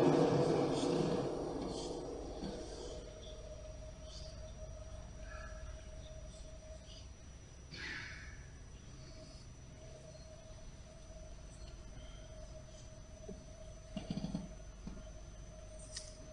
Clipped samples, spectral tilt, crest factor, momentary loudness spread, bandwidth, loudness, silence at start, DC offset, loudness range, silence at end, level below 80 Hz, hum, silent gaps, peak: under 0.1%; -6 dB/octave; 24 dB; 19 LU; 10 kHz; -43 LUFS; 0 s; under 0.1%; 13 LU; 0 s; -54 dBFS; none; none; -18 dBFS